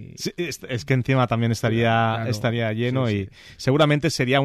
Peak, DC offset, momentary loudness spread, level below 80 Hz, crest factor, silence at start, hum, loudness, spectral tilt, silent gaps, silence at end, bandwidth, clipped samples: -8 dBFS; under 0.1%; 9 LU; -52 dBFS; 14 dB; 0 s; none; -22 LUFS; -6 dB/octave; none; 0 s; 13.5 kHz; under 0.1%